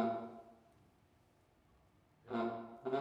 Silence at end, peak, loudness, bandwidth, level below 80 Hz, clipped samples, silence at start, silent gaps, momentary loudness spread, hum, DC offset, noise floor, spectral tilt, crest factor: 0 s; -24 dBFS; -43 LUFS; 8 kHz; -80 dBFS; under 0.1%; 0 s; none; 17 LU; none; under 0.1%; -71 dBFS; -7.5 dB/octave; 20 dB